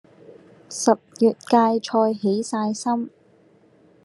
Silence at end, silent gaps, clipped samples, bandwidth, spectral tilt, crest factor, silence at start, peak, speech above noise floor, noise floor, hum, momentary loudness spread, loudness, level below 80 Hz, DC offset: 0.95 s; none; under 0.1%; 12 kHz; -5 dB/octave; 20 dB; 0.3 s; -2 dBFS; 35 dB; -56 dBFS; none; 8 LU; -21 LUFS; -78 dBFS; under 0.1%